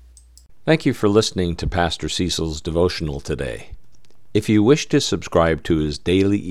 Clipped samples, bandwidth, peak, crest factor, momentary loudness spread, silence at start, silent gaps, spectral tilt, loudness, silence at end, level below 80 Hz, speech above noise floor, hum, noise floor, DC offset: under 0.1%; 13.5 kHz; -2 dBFS; 18 dB; 10 LU; 0 s; none; -5.5 dB/octave; -20 LUFS; 0 s; -38 dBFS; 37 dB; none; -56 dBFS; 1%